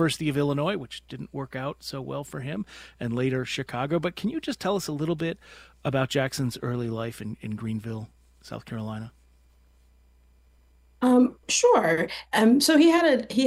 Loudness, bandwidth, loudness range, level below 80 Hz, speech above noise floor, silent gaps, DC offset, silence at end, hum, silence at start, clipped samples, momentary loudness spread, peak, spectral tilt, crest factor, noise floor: -25 LUFS; 16 kHz; 14 LU; -58 dBFS; 33 dB; none; under 0.1%; 0 s; none; 0 s; under 0.1%; 17 LU; -8 dBFS; -5 dB/octave; 18 dB; -59 dBFS